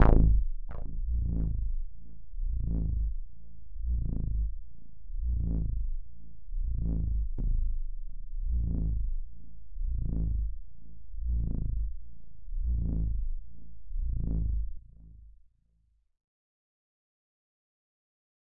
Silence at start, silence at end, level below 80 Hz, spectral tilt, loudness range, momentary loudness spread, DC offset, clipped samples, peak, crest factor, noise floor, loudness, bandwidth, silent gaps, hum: 0 s; 2.2 s; -32 dBFS; -11.5 dB/octave; 4 LU; 22 LU; 1%; under 0.1%; -8 dBFS; 22 dB; -70 dBFS; -35 LUFS; 2.7 kHz; none; none